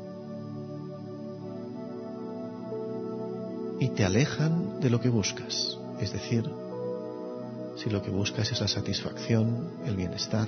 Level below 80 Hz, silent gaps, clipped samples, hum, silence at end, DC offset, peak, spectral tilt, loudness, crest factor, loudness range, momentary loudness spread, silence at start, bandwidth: -62 dBFS; none; under 0.1%; none; 0 s; under 0.1%; -10 dBFS; -5.5 dB/octave; -31 LUFS; 20 dB; 9 LU; 13 LU; 0 s; 6.6 kHz